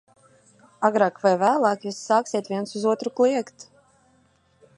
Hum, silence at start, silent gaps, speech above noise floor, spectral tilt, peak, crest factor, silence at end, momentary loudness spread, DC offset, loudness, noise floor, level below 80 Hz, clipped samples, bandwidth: none; 0.8 s; none; 40 dB; -5 dB/octave; -4 dBFS; 20 dB; 1.15 s; 9 LU; under 0.1%; -23 LUFS; -62 dBFS; -76 dBFS; under 0.1%; 11.5 kHz